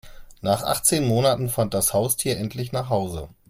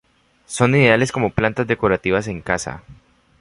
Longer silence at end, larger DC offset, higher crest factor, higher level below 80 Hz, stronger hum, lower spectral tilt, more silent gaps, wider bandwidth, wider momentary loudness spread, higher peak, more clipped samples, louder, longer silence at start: second, 0.2 s vs 0.45 s; neither; about the same, 18 dB vs 18 dB; about the same, -48 dBFS vs -44 dBFS; neither; about the same, -4.5 dB/octave vs -5.5 dB/octave; neither; first, 16 kHz vs 11.5 kHz; second, 8 LU vs 13 LU; second, -6 dBFS vs -2 dBFS; neither; second, -22 LUFS vs -18 LUFS; second, 0.05 s vs 0.5 s